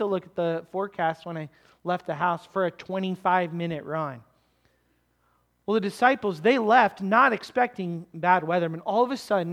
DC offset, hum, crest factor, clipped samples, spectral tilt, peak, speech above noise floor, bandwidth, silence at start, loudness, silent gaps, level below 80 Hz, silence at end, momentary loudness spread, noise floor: under 0.1%; none; 20 dB; under 0.1%; -6.5 dB/octave; -6 dBFS; 44 dB; 14.5 kHz; 0 s; -25 LUFS; none; -70 dBFS; 0 s; 13 LU; -69 dBFS